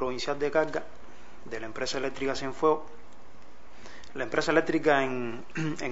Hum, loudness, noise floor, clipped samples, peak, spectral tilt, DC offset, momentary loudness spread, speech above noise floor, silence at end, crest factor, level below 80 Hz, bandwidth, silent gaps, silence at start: none; -29 LUFS; -54 dBFS; under 0.1%; -8 dBFS; -4.5 dB/octave; 2%; 20 LU; 25 dB; 0 s; 22 dB; -58 dBFS; 8 kHz; none; 0 s